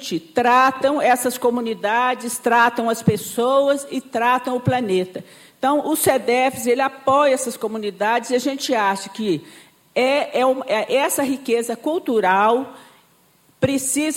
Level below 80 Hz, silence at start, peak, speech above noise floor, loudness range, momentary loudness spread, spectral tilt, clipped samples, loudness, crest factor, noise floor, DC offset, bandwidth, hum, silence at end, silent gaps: -62 dBFS; 0 s; -4 dBFS; 37 dB; 2 LU; 8 LU; -4 dB/octave; under 0.1%; -19 LUFS; 16 dB; -57 dBFS; under 0.1%; 17 kHz; none; 0 s; none